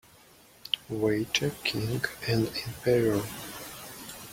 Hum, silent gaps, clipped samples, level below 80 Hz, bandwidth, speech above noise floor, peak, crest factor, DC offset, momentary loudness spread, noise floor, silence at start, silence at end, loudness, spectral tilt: none; none; under 0.1%; -58 dBFS; 16.5 kHz; 28 dB; -8 dBFS; 22 dB; under 0.1%; 15 LU; -56 dBFS; 0.65 s; 0 s; -29 LUFS; -4.5 dB/octave